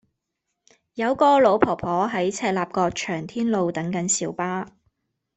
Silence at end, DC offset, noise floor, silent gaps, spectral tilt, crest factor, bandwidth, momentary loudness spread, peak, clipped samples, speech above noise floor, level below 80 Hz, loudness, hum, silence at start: 0.7 s; under 0.1%; -80 dBFS; none; -4.5 dB/octave; 22 dB; 8.4 kHz; 11 LU; -2 dBFS; under 0.1%; 58 dB; -58 dBFS; -22 LUFS; none; 0.95 s